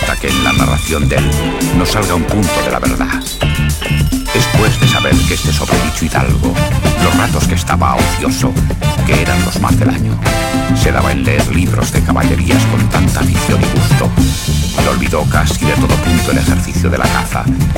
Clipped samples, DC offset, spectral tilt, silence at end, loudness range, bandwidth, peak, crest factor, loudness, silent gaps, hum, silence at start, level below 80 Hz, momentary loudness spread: under 0.1%; under 0.1%; -5 dB/octave; 0 s; 1 LU; 17 kHz; 0 dBFS; 12 dB; -13 LUFS; none; none; 0 s; -20 dBFS; 3 LU